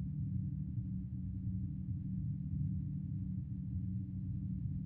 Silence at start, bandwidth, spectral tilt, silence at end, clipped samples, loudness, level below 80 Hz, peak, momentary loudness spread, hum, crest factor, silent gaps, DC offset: 0 s; 0.9 kHz; -15 dB/octave; 0 s; under 0.1%; -41 LUFS; -52 dBFS; -28 dBFS; 3 LU; none; 12 dB; none; under 0.1%